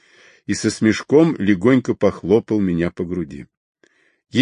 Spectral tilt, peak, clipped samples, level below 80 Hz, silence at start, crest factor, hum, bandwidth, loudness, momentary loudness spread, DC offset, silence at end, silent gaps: -6 dB/octave; -2 dBFS; under 0.1%; -46 dBFS; 0.5 s; 18 dB; none; 10.5 kHz; -18 LUFS; 12 LU; under 0.1%; 0 s; 3.57-3.75 s